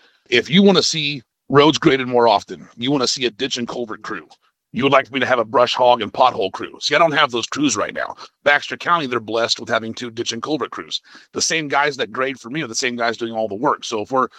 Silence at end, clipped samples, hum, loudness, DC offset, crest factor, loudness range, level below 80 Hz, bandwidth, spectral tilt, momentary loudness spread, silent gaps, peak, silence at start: 0.1 s; under 0.1%; none; -18 LUFS; under 0.1%; 18 dB; 5 LU; -60 dBFS; 12 kHz; -3.5 dB/octave; 13 LU; none; 0 dBFS; 0.3 s